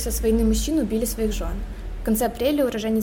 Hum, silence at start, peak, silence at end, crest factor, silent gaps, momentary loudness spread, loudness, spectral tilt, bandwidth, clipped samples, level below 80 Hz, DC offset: none; 0 s; -10 dBFS; 0 s; 12 dB; none; 10 LU; -23 LUFS; -5 dB/octave; 17 kHz; under 0.1%; -30 dBFS; under 0.1%